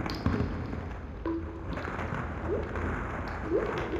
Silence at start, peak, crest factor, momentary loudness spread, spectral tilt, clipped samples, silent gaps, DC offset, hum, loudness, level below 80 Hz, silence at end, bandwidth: 0 s; -12 dBFS; 20 dB; 7 LU; -7.5 dB/octave; under 0.1%; none; under 0.1%; none; -34 LUFS; -40 dBFS; 0 s; 13 kHz